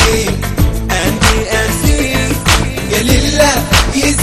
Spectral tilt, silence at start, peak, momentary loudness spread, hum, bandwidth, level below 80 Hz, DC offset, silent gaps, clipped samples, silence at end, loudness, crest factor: -4 dB/octave; 0 s; 0 dBFS; 5 LU; none; 15.5 kHz; -18 dBFS; under 0.1%; none; 0.4%; 0 s; -12 LUFS; 12 dB